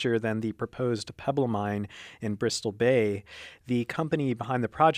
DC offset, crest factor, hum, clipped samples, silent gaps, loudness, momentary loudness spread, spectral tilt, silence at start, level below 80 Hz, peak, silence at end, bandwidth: under 0.1%; 20 dB; none; under 0.1%; none; -29 LUFS; 12 LU; -6 dB/octave; 0 s; -62 dBFS; -8 dBFS; 0 s; 15.5 kHz